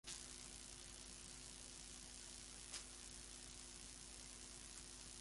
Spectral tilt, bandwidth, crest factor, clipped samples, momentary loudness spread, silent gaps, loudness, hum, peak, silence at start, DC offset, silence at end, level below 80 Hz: -1 dB/octave; 11.5 kHz; 24 dB; under 0.1%; 3 LU; none; -54 LUFS; none; -32 dBFS; 0.05 s; under 0.1%; 0 s; -66 dBFS